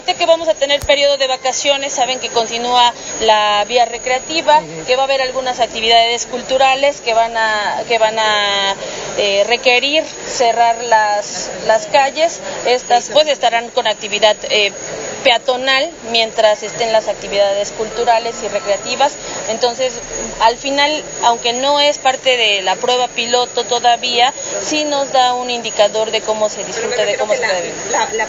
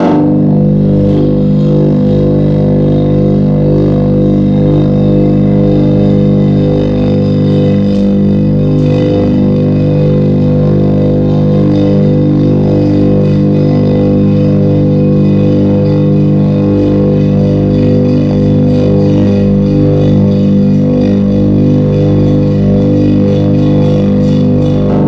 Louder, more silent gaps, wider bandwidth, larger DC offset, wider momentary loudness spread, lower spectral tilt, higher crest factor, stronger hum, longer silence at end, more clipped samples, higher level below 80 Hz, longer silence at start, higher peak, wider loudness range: second, -14 LUFS vs -9 LUFS; neither; first, 10 kHz vs 6 kHz; neither; first, 6 LU vs 1 LU; second, -1 dB/octave vs -10.5 dB/octave; first, 14 dB vs 8 dB; second, none vs 50 Hz at -10 dBFS; about the same, 0 s vs 0 s; neither; second, -48 dBFS vs -26 dBFS; about the same, 0 s vs 0 s; about the same, 0 dBFS vs 0 dBFS; about the same, 2 LU vs 1 LU